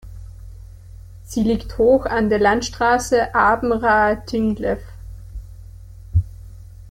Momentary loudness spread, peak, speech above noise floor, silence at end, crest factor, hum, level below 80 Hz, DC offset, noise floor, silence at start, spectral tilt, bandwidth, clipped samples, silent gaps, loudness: 22 LU; -4 dBFS; 21 dB; 0 s; 16 dB; none; -36 dBFS; under 0.1%; -39 dBFS; 0.05 s; -5.5 dB/octave; 16.5 kHz; under 0.1%; none; -18 LUFS